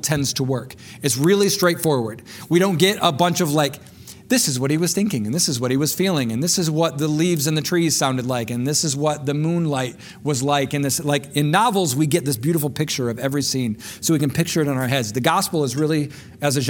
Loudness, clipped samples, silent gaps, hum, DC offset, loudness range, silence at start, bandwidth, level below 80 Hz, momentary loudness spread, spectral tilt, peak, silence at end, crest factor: -20 LUFS; under 0.1%; none; none; under 0.1%; 2 LU; 0 s; 18 kHz; -56 dBFS; 7 LU; -4.5 dB/octave; -2 dBFS; 0 s; 18 dB